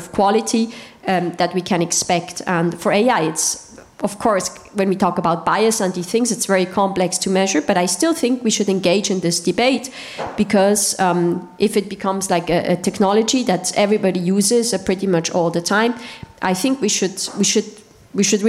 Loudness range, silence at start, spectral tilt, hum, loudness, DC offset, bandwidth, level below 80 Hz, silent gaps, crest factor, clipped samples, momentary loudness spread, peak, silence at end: 2 LU; 0 s; -4 dB/octave; none; -18 LUFS; under 0.1%; 16 kHz; -54 dBFS; none; 12 dB; under 0.1%; 6 LU; -6 dBFS; 0 s